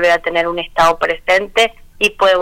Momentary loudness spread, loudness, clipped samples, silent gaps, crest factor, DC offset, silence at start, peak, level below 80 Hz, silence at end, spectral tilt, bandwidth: 5 LU; -14 LUFS; under 0.1%; none; 10 dB; under 0.1%; 0 s; -4 dBFS; -40 dBFS; 0 s; -2.5 dB/octave; 18 kHz